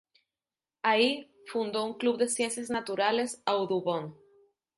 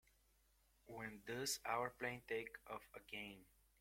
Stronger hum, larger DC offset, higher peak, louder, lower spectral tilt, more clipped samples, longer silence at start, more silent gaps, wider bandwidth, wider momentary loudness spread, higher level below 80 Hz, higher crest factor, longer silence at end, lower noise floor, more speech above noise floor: neither; neither; first, -10 dBFS vs -28 dBFS; first, -29 LUFS vs -47 LUFS; about the same, -3 dB/octave vs -2.5 dB/octave; neither; about the same, 0.85 s vs 0.85 s; neither; second, 11.5 kHz vs 16.5 kHz; second, 9 LU vs 12 LU; about the same, -76 dBFS vs -76 dBFS; about the same, 20 dB vs 22 dB; first, 0.65 s vs 0.35 s; first, under -90 dBFS vs -77 dBFS; first, over 61 dB vs 29 dB